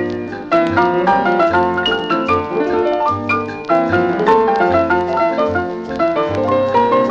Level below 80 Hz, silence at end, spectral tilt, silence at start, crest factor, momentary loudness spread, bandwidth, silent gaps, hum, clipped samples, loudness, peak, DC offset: -46 dBFS; 0 s; -6.5 dB/octave; 0 s; 14 dB; 5 LU; 7.6 kHz; none; none; under 0.1%; -15 LUFS; 0 dBFS; under 0.1%